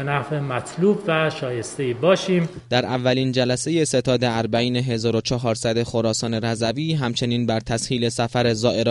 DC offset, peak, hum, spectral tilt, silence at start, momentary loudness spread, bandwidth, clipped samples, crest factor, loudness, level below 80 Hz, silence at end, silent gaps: under 0.1%; -4 dBFS; none; -5 dB/octave; 0 s; 4 LU; 11.5 kHz; under 0.1%; 16 dB; -21 LUFS; -50 dBFS; 0 s; none